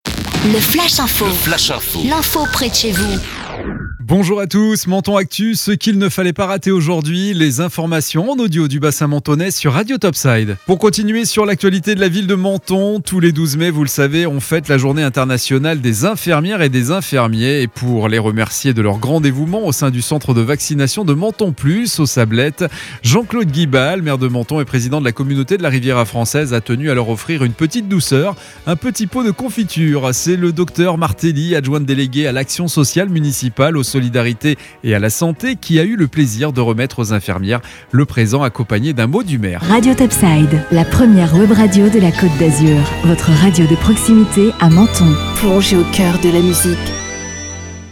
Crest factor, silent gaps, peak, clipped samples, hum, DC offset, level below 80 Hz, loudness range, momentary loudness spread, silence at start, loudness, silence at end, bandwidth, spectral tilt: 14 dB; none; 0 dBFS; under 0.1%; none; under 0.1%; -36 dBFS; 5 LU; 7 LU; 0.05 s; -14 LUFS; 0 s; 18 kHz; -5 dB/octave